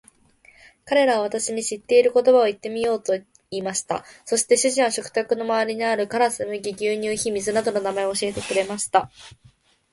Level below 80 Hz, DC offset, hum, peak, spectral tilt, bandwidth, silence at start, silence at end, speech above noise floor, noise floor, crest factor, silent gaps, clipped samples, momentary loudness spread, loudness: -60 dBFS; under 0.1%; none; -4 dBFS; -2.5 dB/octave; 11.5 kHz; 0.85 s; 0.65 s; 33 dB; -55 dBFS; 18 dB; none; under 0.1%; 10 LU; -22 LUFS